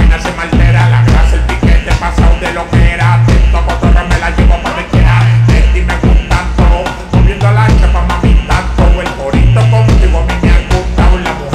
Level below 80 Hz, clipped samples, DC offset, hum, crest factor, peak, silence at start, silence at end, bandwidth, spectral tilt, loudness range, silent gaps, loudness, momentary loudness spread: -10 dBFS; 0.6%; under 0.1%; none; 8 dB; 0 dBFS; 0 s; 0 s; 9.8 kHz; -6.5 dB/octave; 1 LU; none; -10 LUFS; 5 LU